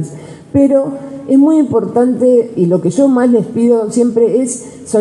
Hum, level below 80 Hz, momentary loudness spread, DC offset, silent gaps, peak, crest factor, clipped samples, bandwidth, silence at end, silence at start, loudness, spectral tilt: none; -52 dBFS; 10 LU; under 0.1%; none; 0 dBFS; 12 dB; under 0.1%; 11.5 kHz; 0 s; 0 s; -12 LUFS; -7.5 dB/octave